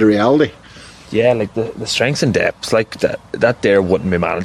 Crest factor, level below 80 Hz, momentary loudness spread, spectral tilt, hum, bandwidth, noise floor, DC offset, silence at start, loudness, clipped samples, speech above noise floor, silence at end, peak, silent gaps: 14 dB; -46 dBFS; 7 LU; -5.5 dB/octave; none; 14 kHz; -39 dBFS; under 0.1%; 0 s; -16 LUFS; under 0.1%; 23 dB; 0 s; -2 dBFS; none